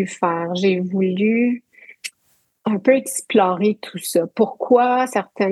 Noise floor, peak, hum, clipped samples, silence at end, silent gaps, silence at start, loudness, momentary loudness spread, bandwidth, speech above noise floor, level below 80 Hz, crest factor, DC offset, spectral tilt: -64 dBFS; -2 dBFS; none; under 0.1%; 0 s; none; 0 s; -19 LUFS; 12 LU; 13 kHz; 45 dB; -78 dBFS; 18 dB; under 0.1%; -5 dB/octave